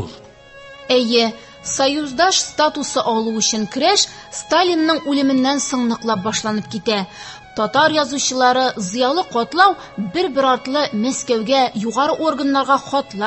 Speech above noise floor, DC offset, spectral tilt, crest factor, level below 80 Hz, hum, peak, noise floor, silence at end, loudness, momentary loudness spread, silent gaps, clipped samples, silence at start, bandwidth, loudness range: 24 dB; under 0.1%; -2.5 dB/octave; 18 dB; -54 dBFS; none; 0 dBFS; -41 dBFS; 0 s; -17 LUFS; 8 LU; none; under 0.1%; 0 s; 8.6 kHz; 2 LU